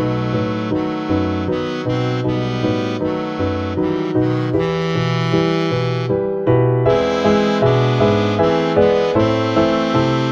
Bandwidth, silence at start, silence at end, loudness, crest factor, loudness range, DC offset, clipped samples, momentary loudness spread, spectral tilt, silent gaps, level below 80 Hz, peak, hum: 7.4 kHz; 0 s; 0 s; -17 LUFS; 16 dB; 5 LU; under 0.1%; under 0.1%; 6 LU; -7.5 dB/octave; none; -42 dBFS; -2 dBFS; none